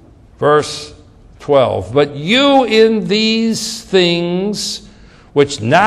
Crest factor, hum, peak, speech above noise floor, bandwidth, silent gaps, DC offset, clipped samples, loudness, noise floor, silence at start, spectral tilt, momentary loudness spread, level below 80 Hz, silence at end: 14 dB; none; 0 dBFS; 28 dB; 14.5 kHz; none; under 0.1%; under 0.1%; -14 LUFS; -41 dBFS; 0.4 s; -4.5 dB/octave; 12 LU; -46 dBFS; 0 s